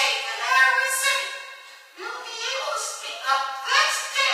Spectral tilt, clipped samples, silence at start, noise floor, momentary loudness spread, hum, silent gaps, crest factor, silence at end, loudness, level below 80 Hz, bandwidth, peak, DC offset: 6.5 dB/octave; under 0.1%; 0 s; -44 dBFS; 17 LU; none; none; 18 dB; 0 s; -22 LUFS; under -90 dBFS; 15.5 kHz; -6 dBFS; under 0.1%